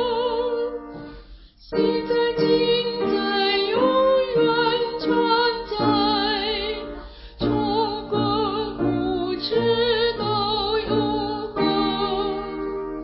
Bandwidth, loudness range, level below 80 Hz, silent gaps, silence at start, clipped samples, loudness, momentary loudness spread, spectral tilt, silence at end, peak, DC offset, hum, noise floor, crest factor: 5.8 kHz; 3 LU; -46 dBFS; none; 0 s; under 0.1%; -22 LUFS; 10 LU; -9.5 dB/octave; 0 s; -6 dBFS; under 0.1%; none; -45 dBFS; 16 dB